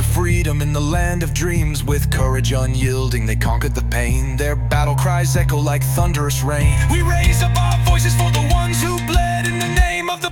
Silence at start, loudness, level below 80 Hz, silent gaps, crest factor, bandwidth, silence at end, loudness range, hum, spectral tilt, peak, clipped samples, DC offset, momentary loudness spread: 0 s; -17 LUFS; -20 dBFS; none; 14 dB; 17 kHz; 0 s; 2 LU; none; -5 dB/octave; -2 dBFS; under 0.1%; under 0.1%; 4 LU